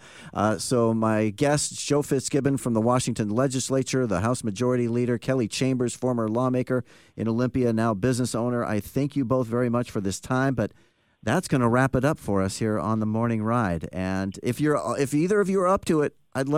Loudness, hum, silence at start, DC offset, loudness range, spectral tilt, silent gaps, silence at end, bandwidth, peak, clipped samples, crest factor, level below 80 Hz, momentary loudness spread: -25 LUFS; none; 0.05 s; 0.1%; 2 LU; -6 dB/octave; none; 0 s; 16 kHz; -8 dBFS; under 0.1%; 16 dB; -54 dBFS; 6 LU